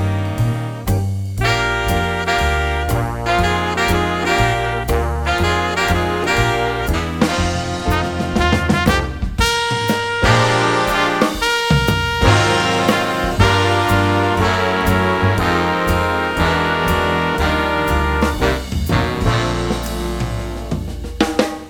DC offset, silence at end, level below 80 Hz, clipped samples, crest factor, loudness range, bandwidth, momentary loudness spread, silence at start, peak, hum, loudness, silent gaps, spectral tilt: under 0.1%; 0 s; -26 dBFS; under 0.1%; 16 dB; 3 LU; over 20 kHz; 6 LU; 0 s; 0 dBFS; none; -17 LUFS; none; -5 dB/octave